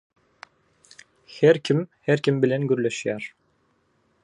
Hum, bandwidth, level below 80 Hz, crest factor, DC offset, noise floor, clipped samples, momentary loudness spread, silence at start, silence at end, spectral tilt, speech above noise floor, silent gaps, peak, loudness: none; 10.5 kHz; -70 dBFS; 20 dB; under 0.1%; -67 dBFS; under 0.1%; 13 LU; 1.3 s; 0.95 s; -6.5 dB/octave; 45 dB; none; -6 dBFS; -23 LUFS